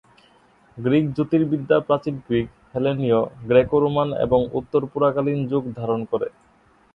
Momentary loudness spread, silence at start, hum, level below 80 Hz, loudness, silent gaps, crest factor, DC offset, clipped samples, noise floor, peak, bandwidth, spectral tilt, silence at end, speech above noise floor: 7 LU; 0.75 s; none; -50 dBFS; -22 LUFS; none; 18 dB; under 0.1%; under 0.1%; -57 dBFS; -2 dBFS; 5.8 kHz; -9.5 dB/octave; 0.65 s; 36 dB